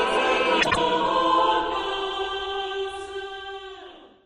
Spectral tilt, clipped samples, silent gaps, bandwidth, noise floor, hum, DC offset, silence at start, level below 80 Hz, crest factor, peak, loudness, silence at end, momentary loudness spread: -3 dB/octave; under 0.1%; none; 10.5 kHz; -45 dBFS; none; under 0.1%; 0 s; -50 dBFS; 18 dB; -6 dBFS; -23 LUFS; 0.2 s; 16 LU